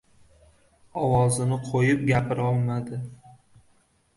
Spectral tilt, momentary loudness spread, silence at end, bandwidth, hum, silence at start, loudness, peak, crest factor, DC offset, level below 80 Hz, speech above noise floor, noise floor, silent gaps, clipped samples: -6.5 dB/octave; 14 LU; 0.85 s; 11.5 kHz; none; 0.95 s; -24 LUFS; -8 dBFS; 18 dB; under 0.1%; -50 dBFS; 40 dB; -63 dBFS; none; under 0.1%